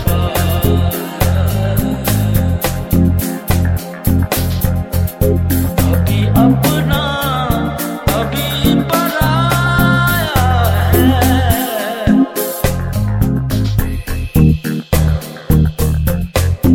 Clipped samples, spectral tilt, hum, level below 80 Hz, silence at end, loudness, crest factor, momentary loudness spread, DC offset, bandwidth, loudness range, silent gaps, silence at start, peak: under 0.1%; -6 dB/octave; none; -22 dBFS; 0 s; -14 LUFS; 14 dB; 6 LU; under 0.1%; 17.5 kHz; 3 LU; none; 0 s; 0 dBFS